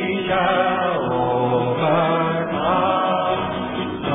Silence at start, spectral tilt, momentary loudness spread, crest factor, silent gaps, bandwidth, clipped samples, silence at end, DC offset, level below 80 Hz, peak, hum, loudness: 0 s; -10 dB/octave; 5 LU; 14 dB; none; 3.9 kHz; under 0.1%; 0 s; under 0.1%; -48 dBFS; -6 dBFS; none; -20 LUFS